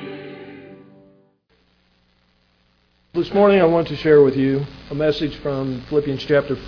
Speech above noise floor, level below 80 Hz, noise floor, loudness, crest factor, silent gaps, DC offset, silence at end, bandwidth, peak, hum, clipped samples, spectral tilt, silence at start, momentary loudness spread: 44 dB; -48 dBFS; -62 dBFS; -18 LUFS; 18 dB; none; under 0.1%; 0 s; 5.4 kHz; -2 dBFS; 60 Hz at -55 dBFS; under 0.1%; -8 dB/octave; 0 s; 20 LU